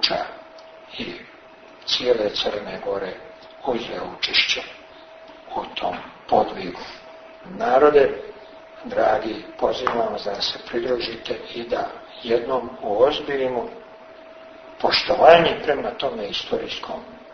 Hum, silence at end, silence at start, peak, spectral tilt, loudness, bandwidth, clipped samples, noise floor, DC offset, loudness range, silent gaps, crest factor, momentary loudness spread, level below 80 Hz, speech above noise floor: none; 0 s; 0 s; 0 dBFS; -4 dB/octave; -22 LUFS; 6.6 kHz; under 0.1%; -46 dBFS; under 0.1%; 6 LU; none; 22 dB; 23 LU; -54 dBFS; 24 dB